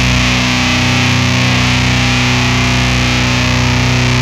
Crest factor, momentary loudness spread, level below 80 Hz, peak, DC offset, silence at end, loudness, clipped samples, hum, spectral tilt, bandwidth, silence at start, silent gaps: 12 dB; 1 LU; -24 dBFS; 0 dBFS; under 0.1%; 0 s; -11 LUFS; under 0.1%; none; -4 dB/octave; 14.5 kHz; 0 s; none